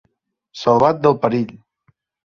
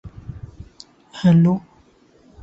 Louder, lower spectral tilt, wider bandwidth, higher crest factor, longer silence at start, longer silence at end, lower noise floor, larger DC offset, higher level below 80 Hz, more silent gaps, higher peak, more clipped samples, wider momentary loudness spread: about the same, -17 LUFS vs -17 LUFS; about the same, -7.5 dB/octave vs -8.5 dB/octave; about the same, 7.2 kHz vs 7.6 kHz; about the same, 18 dB vs 16 dB; first, 0.55 s vs 0.05 s; second, 0.7 s vs 0.85 s; first, -69 dBFS vs -54 dBFS; neither; second, -56 dBFS vs -48 dBFS; neither; first, -2 dBFS vs -6 dBFS; neither; second, 14 LU vs 24 LU